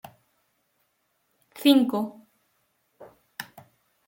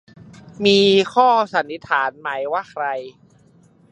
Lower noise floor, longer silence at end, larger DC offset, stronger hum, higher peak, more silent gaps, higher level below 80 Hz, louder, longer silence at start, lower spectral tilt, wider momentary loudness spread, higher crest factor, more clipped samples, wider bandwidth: first, -73 dBFS vs -53 dBFS; second, 0.65 s vs 0.8 s; neither; neither; second, -8 dBFS vs -2 dBFS; neither; second, -78 dBFS vs -62 dBFS; second, -23 LUFS vs -18 LUFS; first, 1.55 s vs 0.6 s; about the same, -4.5 dB/octave vs -4.5 dB/octave; first, 22 LU vs 11 LU; about the same, 22 dB vs 18 dB; neither; first, 17 kHz vs 8.8 kHz